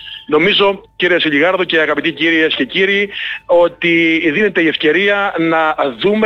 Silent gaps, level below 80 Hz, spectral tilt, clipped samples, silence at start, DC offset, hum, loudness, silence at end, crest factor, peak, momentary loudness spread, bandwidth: none; -52 dBFS; -6 dB/octave; under 0.1%; 0 s; under 0.1%; none; -13 LUFS; 0 s; 10 dB; -4 dBFS; 4 LU; 6.6 kHz